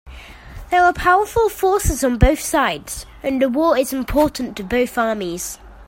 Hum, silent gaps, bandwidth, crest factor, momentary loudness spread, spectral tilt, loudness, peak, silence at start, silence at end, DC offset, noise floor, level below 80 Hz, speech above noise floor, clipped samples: none; none; 16.5 kHz; 18 dB; 11 LU; -4.5 dB/octave; -18 LUFS; 0 dBFS; 0.05 s; 0.05 s; under 0.1%; -37 dBFS; -30 dBFS; 20 dB; under 0.1%